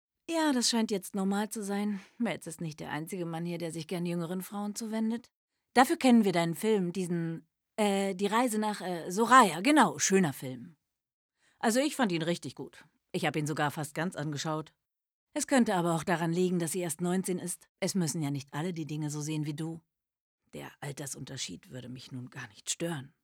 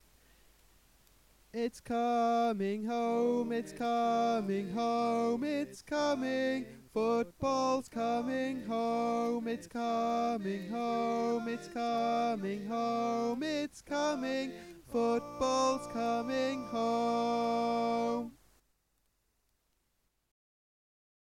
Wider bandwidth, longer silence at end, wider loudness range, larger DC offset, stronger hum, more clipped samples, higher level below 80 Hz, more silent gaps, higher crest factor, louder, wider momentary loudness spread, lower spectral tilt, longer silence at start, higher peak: first, 18.5 kHz vs 16 kHz; second, 0.15 s vs 2.95 s; first, 11 LU vs 3 LU; neither; neither; neither; second, -76 dBFS vs -66 dBFS; first, 5.35-5.48 s, 11.13-11.29 s, 15.11-15.27 s, 17.69-17.75 s, 20.20-20.38 s vs none; first, 22 dB vs 14 dB; first, -30 LUFS vs -33 LUFS; first, 17 LU vs 7 LU; about the same, -4.5 dB/octave vs -5 dB/octave; second, 0.3 s vs 1.55 s; first, -8 dBFS vs -20 dBFS